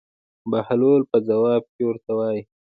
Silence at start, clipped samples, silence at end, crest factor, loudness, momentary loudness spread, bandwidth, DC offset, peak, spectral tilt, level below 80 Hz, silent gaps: 0.45 s; under 0.1%; 0.35 s; 16 dB; -21 LUFS; 9 LU; 4.8 kHz; under 0.1%; -6 dBFS; -11.5 dB/octave; -66 dBFS; 1.69-1.79 s